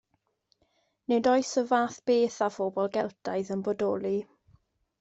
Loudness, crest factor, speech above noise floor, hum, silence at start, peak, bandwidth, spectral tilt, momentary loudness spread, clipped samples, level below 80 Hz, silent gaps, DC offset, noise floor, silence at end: -28 LUFS; 18 dB; 46 dB; none; 1.1 s; -12 dBFS; 8.2 kHz; -5 dB/octave; 8 LU; under 0.1%; -72 dBFS; none; under 0.1%; -73 dBFS; 0.75 s